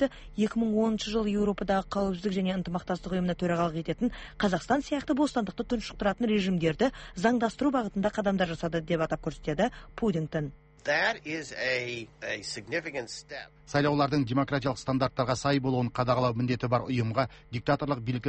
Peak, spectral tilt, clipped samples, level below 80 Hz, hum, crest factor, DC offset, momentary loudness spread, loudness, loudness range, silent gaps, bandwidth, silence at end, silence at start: -12 dBFS; -6 dB/octave; under 0.1%; -50 dBFS; none; 16 dB; under 0.1%; 7 LU; -29 LUFS; 3 LU; none; 8.4 kHz; 0 s; 0 s